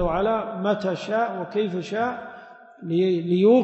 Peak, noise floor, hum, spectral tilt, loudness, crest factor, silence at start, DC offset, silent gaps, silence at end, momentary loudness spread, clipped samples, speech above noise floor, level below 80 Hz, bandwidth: -8 dBFS; -45 dBFS; none; -7.5 dB/octave; -24 LUFS; 16 dB; 0 s; under 0.1%; none; 0 s; 14 LU; under 0.1%; 23 dB; -46 dBFS; 8.2 kHz